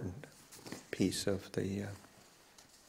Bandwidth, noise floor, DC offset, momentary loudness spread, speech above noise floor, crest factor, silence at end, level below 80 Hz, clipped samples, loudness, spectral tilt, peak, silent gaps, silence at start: 16 kHz; -62 dBFS; under 0.1%; 25 LU; 25 dB; 22 dB; 0.1 s; -68 dBFS; under 0.1%; -39 LUFS; -5 dB/octave; -18 dBFS; none; 0 s